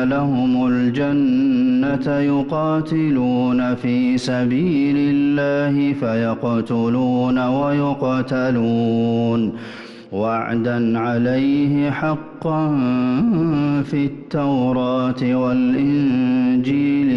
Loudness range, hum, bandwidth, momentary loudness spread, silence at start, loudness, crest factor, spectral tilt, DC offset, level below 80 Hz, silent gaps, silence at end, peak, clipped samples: 2 LU; none; 7.4 kHz; 4 LU; 0 s; -18 LUFS; 8 dB; -8 dB/octave; under 0.1%; -50 dBFS; none; 0 s; -10 dBFS; under 0.1%